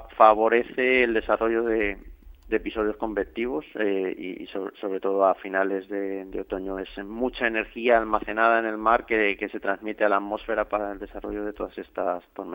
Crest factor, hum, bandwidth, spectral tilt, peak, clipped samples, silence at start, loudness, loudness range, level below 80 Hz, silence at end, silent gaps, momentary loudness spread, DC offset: 22 dB; none; 16.5 kHz; -7.5 dB/octave; -2 dBFS; under 0.1%; 0 s; -25 LUFS; 5 LU; -50 dBFS; 0 s; none; 12 LU; under 0.1%